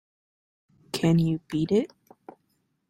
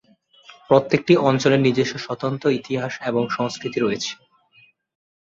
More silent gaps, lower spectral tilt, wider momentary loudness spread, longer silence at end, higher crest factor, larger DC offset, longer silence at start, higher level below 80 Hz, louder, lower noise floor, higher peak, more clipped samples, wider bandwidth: neither; about the same, -7 dB/octave vs -6 dB/octave; about the same, 11 LU vs 10 LU; about the same, 1.05 s vs 1.05 s; about the same, 18 dB vs 20 dB; neither; first, 0.95 s vs 0.5 s; about the same, -62 dBFS vs -62 dBFS; second, -25 LUFS vs -21 LUFS; first, -73 dBFS vs -57 dBFS; second, -10 dBFS vs -2 dBFS; neither; first, 14 kHz vs 7.8 kHz